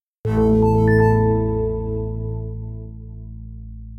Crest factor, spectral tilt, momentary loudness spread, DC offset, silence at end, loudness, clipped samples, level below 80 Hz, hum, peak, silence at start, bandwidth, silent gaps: 16 dB; -10.5 dB/octave; 21 LU; under 0.1%; 0 s; -19 LUFS; under 0.1%; -30 dBFS; none; -4 dBFS; 0.25 s; 5.6 kHz; none